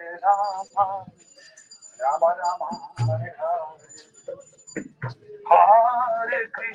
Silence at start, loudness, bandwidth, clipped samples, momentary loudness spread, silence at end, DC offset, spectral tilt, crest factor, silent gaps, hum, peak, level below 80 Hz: 0 s; -22 LUFS; 9.6 kHz; under 0.1%; 23 LU; 0 s; under 0.1%; -5.5 dB/octave; 20 dB; none; none; -2 dBFS; -66 dBFS